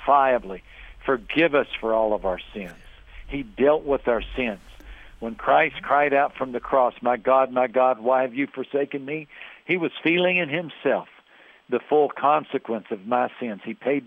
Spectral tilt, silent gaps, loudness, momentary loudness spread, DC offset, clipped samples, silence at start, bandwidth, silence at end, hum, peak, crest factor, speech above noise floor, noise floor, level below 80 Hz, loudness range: -7.5 dB/octave; none; -23 LUFS; 13 LU; under 0.1%; under 0.1%; 0 s; 5.4 kHz; 0 s; none; -6 dBFS; 18 dB; 30 dB; -53 dBFS; -48 dBFS; 4 LU